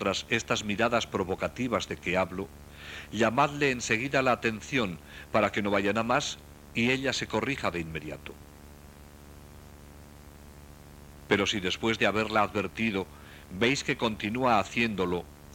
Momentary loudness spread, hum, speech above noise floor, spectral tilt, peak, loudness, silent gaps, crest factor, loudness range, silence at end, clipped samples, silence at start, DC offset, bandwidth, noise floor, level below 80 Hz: 15 LU; none; 21 dB; -4.5 dB/octave; -10 dBFS; -28 LUFS; none; 20 dB; 8 LU; 0 s; under 0.1%; 0 s; under 0.1%; 17 kHz; -50 dBFS; -52 dBFS